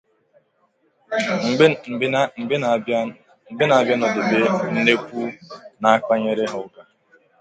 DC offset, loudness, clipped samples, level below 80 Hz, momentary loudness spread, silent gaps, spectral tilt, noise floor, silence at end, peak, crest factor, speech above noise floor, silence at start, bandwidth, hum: under 0.1%; -20 LUFS; under 0.1%; -66 dBFS; 14 LU; none; -5.5 dB/octave; -64 dBFS; 0.6 s; 0 dBFS; 20 dB; 45 dB; 1.1 s; 9 kHz; none